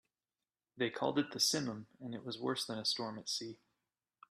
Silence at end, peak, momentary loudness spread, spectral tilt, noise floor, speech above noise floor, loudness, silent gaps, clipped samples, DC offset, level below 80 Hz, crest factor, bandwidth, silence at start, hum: 0.75 s; -18 dBFS; 14 LU; -3 dB/octave; under -90 dBFS; over 52 dB; -37 LUFS; none; under 0.1%; under 0.1%; -82 dBFS; 22 dB; 14.5 kHz; 0.75 s; none